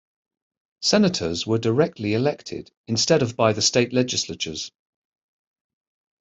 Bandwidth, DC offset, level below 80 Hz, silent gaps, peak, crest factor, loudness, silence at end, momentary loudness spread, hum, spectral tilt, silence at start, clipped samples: 8.2 kHz; under 0.1%; -60 dBFS; 2.77-2.84 s; -4 dBFS; 20 dB; -21 LUFS; 1.55 s; 13 LU; none; -4 dB/octave; 0.8 s; under 0.1%